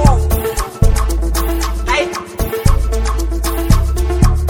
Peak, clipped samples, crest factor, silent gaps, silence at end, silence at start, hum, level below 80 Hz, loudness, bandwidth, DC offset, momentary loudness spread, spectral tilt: 0 dBFS; 0.3%; 14 dB; none; 0 s; 0 s; none; -16 dBFS; -16 LUFS; 18 kHz; under 0.1%; 4 LU; -5.5 dB/octave